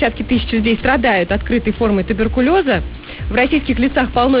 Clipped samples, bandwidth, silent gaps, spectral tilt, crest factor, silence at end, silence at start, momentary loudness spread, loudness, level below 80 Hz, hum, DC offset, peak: under 0.1%; 5.2 kHz; none; -11 dB/octave; 12 dB; 0 s; 0 s; 5 LU; -16 LUFS; -28 dBFS; none; 0.2%; -4 dBFS